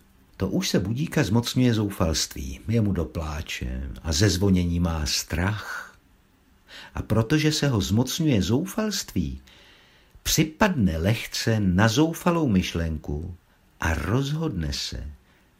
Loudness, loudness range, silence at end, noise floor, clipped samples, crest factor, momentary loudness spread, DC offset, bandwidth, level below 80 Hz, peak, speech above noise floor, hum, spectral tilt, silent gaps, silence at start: -24 LUFS; 3 LU; 0.45 s; -59 dBFS; under 0.1%; 20 dB; 12 LU; under 0.1%; 16 kHz; -38 dBFS; -4 dBFS; 35 dB; none; -5 dB/octave; none; 0.4 s